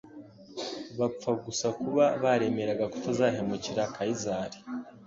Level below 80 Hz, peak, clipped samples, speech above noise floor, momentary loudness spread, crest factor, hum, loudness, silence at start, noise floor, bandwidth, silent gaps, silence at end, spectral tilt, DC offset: -64 dBFS; -12 dBFS; under 0.1%; 20 dB; 14 LU; 18 dB; none; -30 LUFS; 0.05 s; -49 dBFS; 7.8 kHz; none; 0 s; -5 dB/octave; under 0.1%